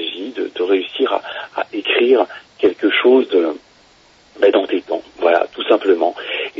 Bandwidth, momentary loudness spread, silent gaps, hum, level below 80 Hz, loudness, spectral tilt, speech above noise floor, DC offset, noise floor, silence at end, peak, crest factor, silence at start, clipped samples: 6 kHz; 11 LU; none; none; -66 dBFS; -17 LUFS; -4.5 dB/octave; 35 dB; under 0.1%; -50 dBFS; 0 s; 0 dBFS; 16 dB; 0 s; under 0.1%